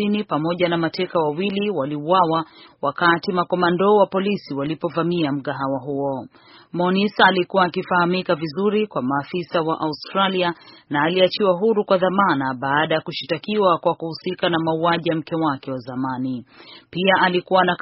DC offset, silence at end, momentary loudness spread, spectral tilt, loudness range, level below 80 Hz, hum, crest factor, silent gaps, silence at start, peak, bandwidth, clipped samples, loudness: under 0.1%; 0.05 s; 9 LU; -3.5 dB/octave; 2 LU; -62 dBFS; none; 20 dB; none; 0 s; 0 dBFS; 5.8 kHz; under 0.1%; -20 LUFS